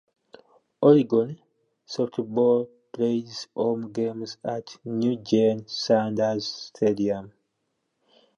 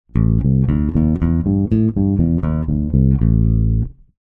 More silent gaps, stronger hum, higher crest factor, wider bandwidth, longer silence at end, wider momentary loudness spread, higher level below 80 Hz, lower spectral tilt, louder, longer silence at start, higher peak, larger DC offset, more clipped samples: neither; neither; first, 20 dB vs 12 dB; first, 7.6 kHz vs 3.1 kHz; first, 1.1 s vs 0.3 s; first, 13 LU vs 4 LU; second, -70 dBFS vs -22 dBFS; second, -6.5 dB/octave vs -13 dB/octave; second, -25 LUFS vs -17 LUFS; first, 0.8 s vs 0.15 s; about the same, -4 dBFS vs -2 dBFS; neither; neither